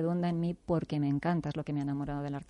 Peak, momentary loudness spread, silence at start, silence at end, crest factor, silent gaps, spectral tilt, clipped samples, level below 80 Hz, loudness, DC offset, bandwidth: -18 dBFS; 4 LU; 0 s; 0.05 s; 16 dB; none; -9 dB/octave; under 0.1%; -56 dBFS; -33 LUFS; under 0.1%; 9.4 kHz